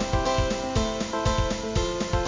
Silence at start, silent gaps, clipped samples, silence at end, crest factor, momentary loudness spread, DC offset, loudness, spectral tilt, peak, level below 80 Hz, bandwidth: 0 s; none; under 0.1%; 0 s; 14 dB; 2 LU; under 0.1%; -26 LUFS; -5 dB/octave; -10 dBFS; -32 dBFS; 7.6 kHz